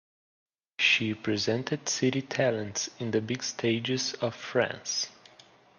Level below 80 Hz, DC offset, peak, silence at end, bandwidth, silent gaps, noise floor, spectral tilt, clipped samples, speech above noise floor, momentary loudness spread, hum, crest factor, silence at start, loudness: -68 dBFS; under 0.1%; -10 dBFS; 0.65 s; 11 kHz; none; -57 dBFS; -3.5 dB/octave; under 0.1%; 27 dB; 8 LU; none; 20 dB; 0.8 s; -29 LUFS